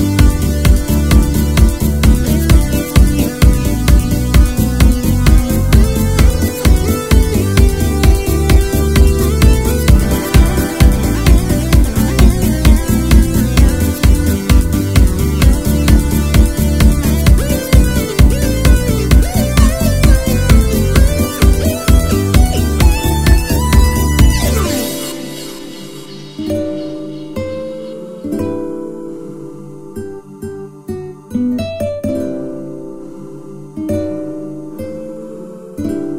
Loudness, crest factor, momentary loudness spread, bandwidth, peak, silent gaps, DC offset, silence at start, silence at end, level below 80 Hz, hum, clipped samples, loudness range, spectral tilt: -13 LUFS; 12 dB; 16 LU; 16.5 kHz; 0 dBFS; none; 2%; 0 s; 0 s; -14 dBFS; none; 1%; 12 LU; -6 dB/octave